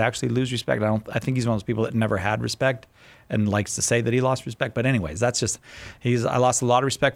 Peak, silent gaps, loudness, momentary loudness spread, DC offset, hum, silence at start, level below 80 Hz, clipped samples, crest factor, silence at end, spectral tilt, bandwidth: -6 dBFS; none; -23 LUFS; 7 LU; under 0.1%; none; 0 s; -50 dBFS; under 0.1%; 18 dB; 0 s; -5 dB/octave; 14 kHz